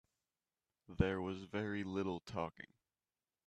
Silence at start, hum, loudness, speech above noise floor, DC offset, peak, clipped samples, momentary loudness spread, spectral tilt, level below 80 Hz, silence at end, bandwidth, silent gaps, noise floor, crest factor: 0.9 s; none; -41 LUFS; over 49 dB; under 0.1%; -18 dBFS; under 0.1%; 20 LU; -7.5 dB/octave; -60 dBFS; 0.8 s; 9.8 kHz; none; under -90 dBFS; 26 dB